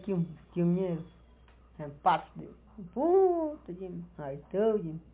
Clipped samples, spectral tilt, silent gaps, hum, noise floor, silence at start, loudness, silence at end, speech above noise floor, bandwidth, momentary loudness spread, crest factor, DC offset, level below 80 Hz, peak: under 0.1%; -7.5 dB/octave; none; none; -58 dBFS; 0 s; -31 LUFS; 0.1 s; 27 dB; 4 kHz; 21 LU; 18 dB; under 0.1%; -60 dBFS; -14 dBFS